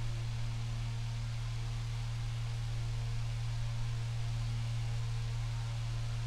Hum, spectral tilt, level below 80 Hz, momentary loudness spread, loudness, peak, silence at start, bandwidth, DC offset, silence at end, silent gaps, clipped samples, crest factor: none; -5.5 dB/octave; -42 dBFS; 2 LU; -38 LUFS; -26 dBFS; 0 s; 11 kHz; under 0.1%; 0 s; none; under 0.1%; 10 dB